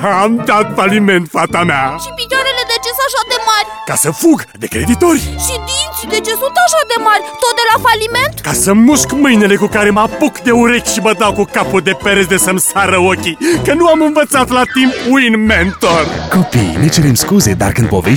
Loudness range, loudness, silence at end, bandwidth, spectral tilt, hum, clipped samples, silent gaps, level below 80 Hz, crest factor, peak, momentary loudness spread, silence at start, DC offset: 3 LU; -11 LUFS; 0 s; over 20 kHz; -4 dB/octave; none; under 0.1%; none; -32 dBFS; 10 dB; 0 dBFS; 5 LU; 0 s; 0.2%